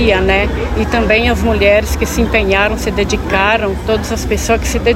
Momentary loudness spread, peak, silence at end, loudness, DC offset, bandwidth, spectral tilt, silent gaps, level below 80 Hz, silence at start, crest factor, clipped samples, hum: 6 LU; 0 dBFS; 0 s; -13 LUFS; under 0.1%; 16.5 kHz; -5 dB/octave; none; -20 dBFS; 0 s; 12 dB; under 0.1%; none